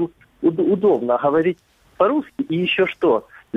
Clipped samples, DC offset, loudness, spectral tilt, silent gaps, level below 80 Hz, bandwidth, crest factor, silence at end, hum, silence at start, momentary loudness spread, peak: under 0.1%; under 0.1%; -19 LUFS; -8 dB/octave; none; -60 dBFS; 5.6 kHz; 16 dB; 0 s; none; 0 s; 6 LU; -4 dBFS